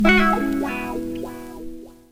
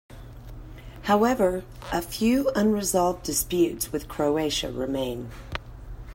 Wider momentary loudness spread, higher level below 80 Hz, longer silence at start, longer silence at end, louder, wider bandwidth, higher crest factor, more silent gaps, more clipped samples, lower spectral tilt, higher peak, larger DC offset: about the same, 21 LU vs 21 LU; first, -36 dBFS vs -44 dBFS; about the same, 0 s vs 0.1 s; about the same, 0 s vs 0 s; first, -22 LUFS vs -25 LUFS; about the same, 16 kHz vs 16.5 kHz; about the same, 20 dB vs 18 dB; neither; neither; about the same, -5.5 dB/octave vs -4.5 dB/octave; first, -2 dBFS vs -8 dBFS; neither